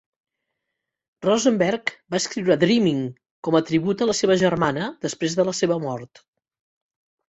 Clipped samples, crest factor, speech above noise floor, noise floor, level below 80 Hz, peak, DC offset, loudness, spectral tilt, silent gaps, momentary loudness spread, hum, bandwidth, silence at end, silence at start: under 0.1%; 20 dB; 61 dB; -82 dBFS; -60 dBFS; -4 dBFS; under 0.1%; -22 LUFS; -5 dB/octave; 3.31-3.43 s; 9 LU; none; 8.2 kHz; 1.3 s; 1.2 s